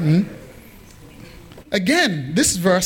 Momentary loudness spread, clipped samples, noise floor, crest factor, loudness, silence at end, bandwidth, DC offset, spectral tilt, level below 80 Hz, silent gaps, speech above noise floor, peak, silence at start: 18 LU; under 0.1%; -43 dBFS; 14 dB; -18 LUFS; 0 s; 17 kHz; under 0.1%; -4 dB/octave; -46 dBFS; none; 25 dB; -6 dBFS; 0 s